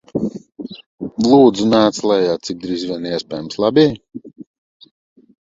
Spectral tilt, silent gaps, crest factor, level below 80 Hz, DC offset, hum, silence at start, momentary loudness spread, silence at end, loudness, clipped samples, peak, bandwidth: -5.5 dB/octave; 0.86-0.98 s; 18 dB; -54 dBFS; under 0.1%; none; 0.15 s; 22 LU; 1.2 s; -16 LUFS; under 0.1%; 0 dBFS; 7.8 kHz